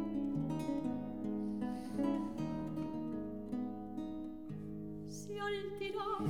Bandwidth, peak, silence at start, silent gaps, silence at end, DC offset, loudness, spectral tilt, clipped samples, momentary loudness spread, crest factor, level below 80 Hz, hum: 16 kHz; -24 dBFS; 0 s; none; 0 s; 0.2%; -41 LUFS; -7 dB/octave; under 0.1%; 8 LU; 16 dB; -62 dBFS; none